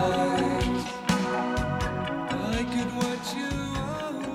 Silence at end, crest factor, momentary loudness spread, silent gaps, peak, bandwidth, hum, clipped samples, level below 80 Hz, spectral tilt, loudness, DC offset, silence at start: 0 s; 18 dB; 6 LU; none; -10 dBFS; 16 kHz; none; under 0.1%; -42 dBFS; -5 dB/octave; -28 LUFS; under 0.1%; 0 s